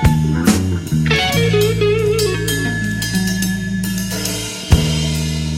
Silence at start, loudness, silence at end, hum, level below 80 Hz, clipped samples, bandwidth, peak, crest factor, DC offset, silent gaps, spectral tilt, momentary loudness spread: 0 s; -17 LUFS; 0 s; none; -28 dBFS; under 0.1%; 16.5 kHz; 0 dBFS; 16 dB; under 0.1%; none; -5 dB/octave; 6 LU